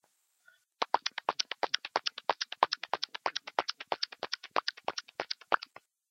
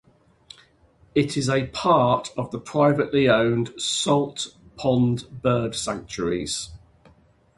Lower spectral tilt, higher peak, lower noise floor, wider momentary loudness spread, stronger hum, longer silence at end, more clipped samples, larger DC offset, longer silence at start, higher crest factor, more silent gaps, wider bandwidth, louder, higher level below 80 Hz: second, 0 dB/octave vs -5 dB/octave; second, -8 dBFS vs -4 dBFS; first, -68 dBFS vs -58 dBFS; about the same, 8 LU vs 10 LU; neither; second, 0.5 s vs 0.8 s; neither; neither; second, 0.8 s vs 1.15 s; first, 28 dB vs 20 dB; neither; first, 16 kHz vs 11.5 kHz; second, -34 LUFS vs -23 LUFS; second, -82 dBFS vs -52 dBFS